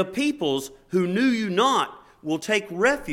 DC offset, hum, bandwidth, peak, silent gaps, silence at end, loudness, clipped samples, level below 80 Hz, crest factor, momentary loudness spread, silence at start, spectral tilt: under 0.1%; none; 16 kHz; -6 dBFS; none; 0 s; -24 LUFS; under 0.1%; -56 dBFS; 18 dB; 9 LU; 0 s; -4.5 dB/octave